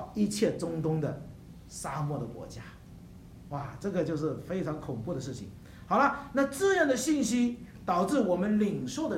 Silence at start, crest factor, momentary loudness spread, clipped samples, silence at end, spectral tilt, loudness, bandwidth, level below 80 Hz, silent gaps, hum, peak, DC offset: 0 s; 20 dB; 20 LU; under 0.1%; 0 s; -5.5 dB/octave; -30 LUFS; 16 kHz; -56 dBFS; none; none; -10 dBFS; under 0.1%